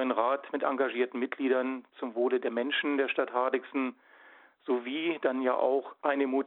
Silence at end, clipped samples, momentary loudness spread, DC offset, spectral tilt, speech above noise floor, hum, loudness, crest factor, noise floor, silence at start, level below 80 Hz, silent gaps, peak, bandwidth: 0 s; under 0.1%; 6 LU; under 0.1%; -7.5 dB/octave; 27 dB; none; -30 LUFS; 18 dB; -57 dBFS; 0 s; -86 dBFS; none; -12 dBFS; 4.1 kHz